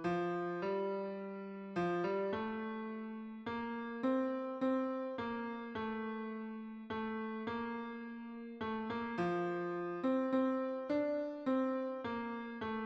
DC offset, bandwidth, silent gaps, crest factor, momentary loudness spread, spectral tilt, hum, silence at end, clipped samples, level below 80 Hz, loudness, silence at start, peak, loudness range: under 0.1%; 7.4 kHz; none; 16 dB; 9 LU; -8 dB/octave; none; 0 s; under 0.1%; -74 dBFS; -39 LUFS; 0 s; -22 dBFS; 5 LU